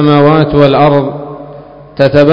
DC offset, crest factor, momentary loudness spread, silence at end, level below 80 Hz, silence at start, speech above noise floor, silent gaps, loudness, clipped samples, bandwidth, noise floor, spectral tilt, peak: under 0.1%; 8 dB; 21 LU; 0 s; -36 dBFS; 0 s; 24 dB; none; -8 LUFS; 3%; 6.2 kHz; -31 dBFS; -9 dB/octave; 0 dBFS